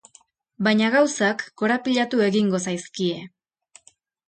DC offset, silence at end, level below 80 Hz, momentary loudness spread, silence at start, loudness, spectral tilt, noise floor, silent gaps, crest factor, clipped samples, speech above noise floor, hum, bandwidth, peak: under 0.1%; 1 s; -68 dBFS; 8 LU; 0.6 s; -22 LUFS; -4.5 dB/octave; -58 dBFS; none; 16 dB; under 0.1%; 36 dB; none; 9.2 kHz; -8 dBFS